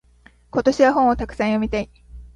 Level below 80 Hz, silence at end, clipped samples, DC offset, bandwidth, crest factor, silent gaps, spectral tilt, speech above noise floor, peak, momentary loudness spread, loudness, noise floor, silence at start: -40 dBFS; 0.1 s; under 0.1%; under 0.1%; 10.5 kHz; 18 dB; none; -6 dB/octave; 34 dB; -2 dBFS; 11 LU; -20 LUFS; -53 dBFS; 0.55 s